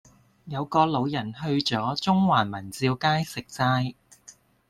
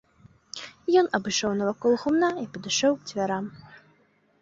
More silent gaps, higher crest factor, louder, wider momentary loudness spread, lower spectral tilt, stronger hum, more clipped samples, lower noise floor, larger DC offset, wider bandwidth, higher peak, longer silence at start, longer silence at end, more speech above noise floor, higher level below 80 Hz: neither; about the same, 20 dB vs 18 dB; about the same, -25 LUFS vs -25 LUFS; second, 10 LU vs 16 LU; first, -5.5 dB/octave vs -3.5 dB/octave; neither; neither; second, -54 dBFS vs -64 dBFS; neither; first, 14 kHz vs 7.8 kHz; about the same, -6 dBFS vs -8 dBFS; about the same, 0.45 s vs 0.55 s; second, 0.4 s vs 0.65 s; second, 29 dB vs 39 dB; about the same, -60 dBFS vs -64 dBFS